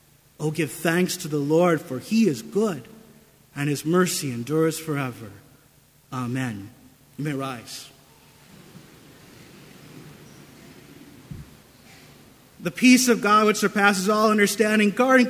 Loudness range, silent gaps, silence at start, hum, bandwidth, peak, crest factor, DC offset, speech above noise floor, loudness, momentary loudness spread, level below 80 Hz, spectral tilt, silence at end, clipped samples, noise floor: 25 LU; none; 0.4 s; none; 16 kHz; -4 dBFS; 22 dB; under 0.1%; 35 dB; -22 LUFS; 19 LU; -62 dBFS; -4.5 dB/octave; 0 s; under 0.1%; -56 dBFS